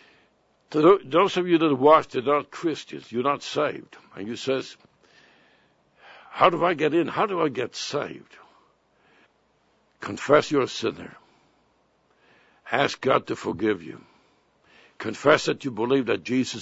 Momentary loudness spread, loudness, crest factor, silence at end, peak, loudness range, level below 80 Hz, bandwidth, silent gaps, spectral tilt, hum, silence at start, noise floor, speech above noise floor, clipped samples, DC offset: 17 LU; -23 LUFS; 22 dB; 0 s; -2 dBFS; 8 LU; -66 dBFS; 8 kHz; none; -5 dB/octave; none; 0.7 s; -66 dBFS; 42 dB; under 0.1%; under 0.1%